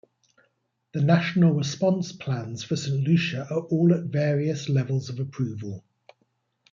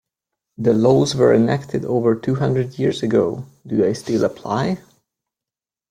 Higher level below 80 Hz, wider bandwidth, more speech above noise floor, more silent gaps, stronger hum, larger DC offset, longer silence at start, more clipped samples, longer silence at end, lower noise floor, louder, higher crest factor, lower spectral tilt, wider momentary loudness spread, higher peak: second, -68 dBFS vs -54 dBFS; second, 7.6 kHz vs 14.5 kHz; second, 48 dB vs 71 dB; neither; neither; neither; first, 0.95 s vs 0.6 s; neither; second, 0.95 s vs 1.15 s; second, -72 dBFS vs -89 dBFS; second, -25 LUFS vs -19 LUFS; about the same, 20 dB vs 16 dB; about the same, -7 dB/octave vs -7 dB/octave; about the same, 9 LU vs 9 LU; second, -6 dBFS vs -2 dBFS